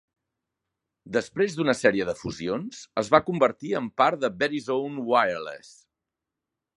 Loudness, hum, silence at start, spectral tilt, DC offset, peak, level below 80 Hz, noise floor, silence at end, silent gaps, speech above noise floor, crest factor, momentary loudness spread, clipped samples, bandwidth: -25 LUFS; none; 1.05 s; -5 dB/octave; under 0.1%; -2 dBFS; -62 dBFS; -86 dBFS; 1.2 s; none; 61 dB; 24 dB; 10 LU; under 0.1%; 11.5 kHz